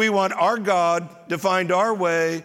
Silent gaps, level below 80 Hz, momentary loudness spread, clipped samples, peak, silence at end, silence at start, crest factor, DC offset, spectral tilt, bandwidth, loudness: none; -74 dBFS; 6 LU; under 0.1%; -6 dBFS; 0 s; 0 s; 14 dB; under 0.1%; -4.5 dB/octave; 16.5 kHz; -21 LUFS